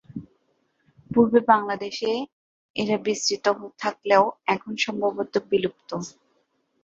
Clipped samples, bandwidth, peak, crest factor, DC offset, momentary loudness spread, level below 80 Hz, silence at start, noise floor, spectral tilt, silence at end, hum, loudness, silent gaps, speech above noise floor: under 0.1%; 8 kHz; -2 dBFS; 22 dB; under 0.1%; 15 LU; -64 dBFS; 0.15 s; -69 dBFS; -4 dB/octave; 0.75 s; none; -24 LUFS; 2.32-2.74 s; 46 dB